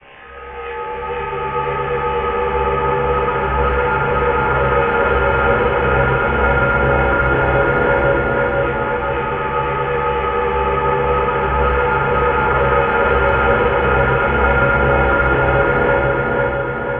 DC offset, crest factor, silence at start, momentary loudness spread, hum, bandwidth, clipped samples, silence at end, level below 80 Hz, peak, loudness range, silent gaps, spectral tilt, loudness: under 0.1%; 14 dB; 0.15 s; 5 LU; none; 4.3 kHz; under 0.1%; 0 s; -26 dBFS; -2 dBFS; 3 LU; none; -10 dB/octave; -16 LUFS